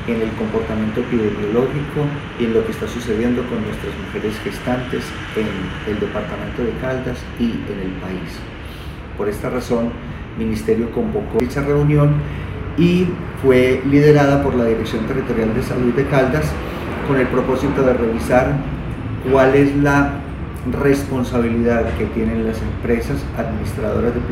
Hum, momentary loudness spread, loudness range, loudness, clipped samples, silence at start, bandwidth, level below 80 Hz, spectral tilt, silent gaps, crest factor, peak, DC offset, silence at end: none; 11 LU; 8 LU; -19 LUFS; under 0.1%; 0 s; 16 kHz; -32 dBFS; -7.5 dB/octave; none; 18 dB; 0 dBFS; under 0.1%; 0 s